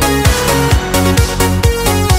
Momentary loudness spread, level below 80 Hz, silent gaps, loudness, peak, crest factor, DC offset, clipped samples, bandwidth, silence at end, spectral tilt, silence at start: 2 LU; -18 dBFS; none; -12 LUFS; 0 dBFS; 12 dB; under 0.1%; under 0.1%; 16.5 kHz; 0 s; -4.5 dB/octave; 0 s